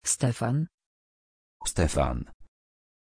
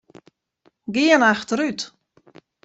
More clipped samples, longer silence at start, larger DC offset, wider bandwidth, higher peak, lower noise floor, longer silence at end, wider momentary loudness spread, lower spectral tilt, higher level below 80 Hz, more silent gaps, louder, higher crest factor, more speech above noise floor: neither; second, 0.05 s vs 0.9 s; neither; first, 10.5 kHz vs 8.2 kHz; second, -8 dBFS vs -4 dBFS; first, under -90 dBFS vs -63 dBFS; about the same, 0.7 s vs 0.8 s; second, 11 LU vs 18 LU; first, -5 dB/octave vs -3.5 dB/octave; first, -40 dBFS vs -66 dBFS; first, 0.74-0.78 s, 0.86-1.60 s, 2.34-2.40 s vs none; second, -29 LUFS vs -19 LUFS; about the same, 22 dB vs 20 dB; first, over 63 dB vs 44 dB